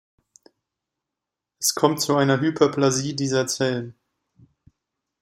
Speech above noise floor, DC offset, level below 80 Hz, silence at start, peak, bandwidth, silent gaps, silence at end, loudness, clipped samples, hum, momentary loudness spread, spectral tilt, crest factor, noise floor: 65 dB; under 0.1%; -64 dBFS; 1.6 s; -2 dBFS; 15.5 kHz; none; 1.3 s; -21 LUFS; under 0.1%; none; 5 LU; -4 dB/octave; 22 dB; -86 dBFS